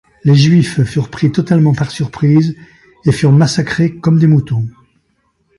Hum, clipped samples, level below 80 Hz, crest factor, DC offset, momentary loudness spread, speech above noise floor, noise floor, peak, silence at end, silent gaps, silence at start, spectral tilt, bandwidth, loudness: none; under 0.1%; -44 dBFS; 12 dB; under 0.1%; 9 LU; 50 dB; -61 dBFS; 0 dBFS; 0.9 s; none; 0.25 s; -7 dB/octave; 11.5 kHz; -12 LUFS